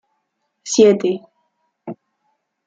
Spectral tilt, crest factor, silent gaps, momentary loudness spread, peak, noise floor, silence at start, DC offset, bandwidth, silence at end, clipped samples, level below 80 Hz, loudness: -4.5 dB/octave; 20 dB; none; 24 LU; -2 dBFS; -72 dBFS; 0.65 s; under 0.1%; 9 kHz; 0.75 s; under 0.1%; -66 dBFS; -16 LUFS